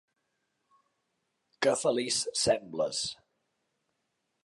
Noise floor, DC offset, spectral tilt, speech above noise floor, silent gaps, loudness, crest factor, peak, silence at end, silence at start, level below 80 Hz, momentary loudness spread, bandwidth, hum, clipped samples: -81 dBFS; under 0.1%; -2 dB/octave; 51 dB; none; -30 LUFS; 22 dB; -12 dBFS; 1.3 s; 1.6 s; -68 dBFS; 7 LU; 11.5 kHz; none; under 0.1%